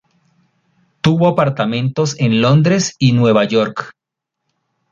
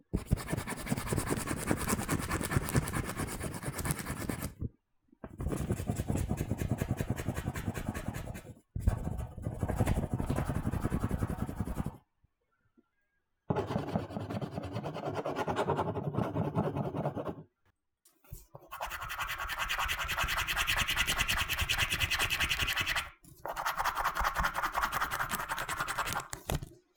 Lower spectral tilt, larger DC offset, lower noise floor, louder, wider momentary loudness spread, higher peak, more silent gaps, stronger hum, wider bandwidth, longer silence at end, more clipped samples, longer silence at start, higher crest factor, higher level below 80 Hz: first, -6 dB/octave vs -4 dB/octave; neither; about the same, -79 dBFS vs -79 dBFS; first, -14 LUFS vs -34 LUFS; second, 7 LU vs 11 LU; first, -2 dBFS vs -10 dBFS; neither; neither; second, 7.6 kHz vs over 20 kHz; first, 1 s vs 0.2 s; neither; first, 1.05 s vs 0.15 s; second, 14 dB vs 24 dB; second, -52 dBFS vs -44 dBFS